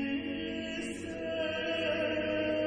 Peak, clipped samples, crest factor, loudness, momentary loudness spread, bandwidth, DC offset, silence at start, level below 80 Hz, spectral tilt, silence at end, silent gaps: -20 dBFS; under 0.1%; 14 dB; -34 LUFS; 6 LU; 10.5 kHz; under 0.1%; 0 s; -58 dBFS; -5 dB/octave; 0 s; none